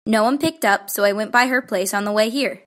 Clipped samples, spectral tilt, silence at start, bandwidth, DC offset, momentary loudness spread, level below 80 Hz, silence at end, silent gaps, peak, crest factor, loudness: under 0.1%; -3.5 dB/octave; 0.05 s; 16.5 kHz; under 0.1%; 4 LU; -64 dBFS; 0.1 s; none; -2 dBFS; 18 dB; -19 LUFS